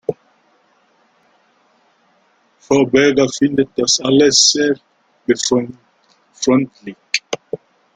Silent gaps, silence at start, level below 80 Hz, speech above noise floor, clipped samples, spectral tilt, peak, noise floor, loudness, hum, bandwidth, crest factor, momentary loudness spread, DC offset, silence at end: none; 0.1 s; -56 dBFS; 43 dB; under 0.1%; -3 dB/octave; 0 dBFS; -58 dBFS; -15 LUFS; none; 9.6 kHz; 18 dB; 17 LU; under 0.1%; 0.4 s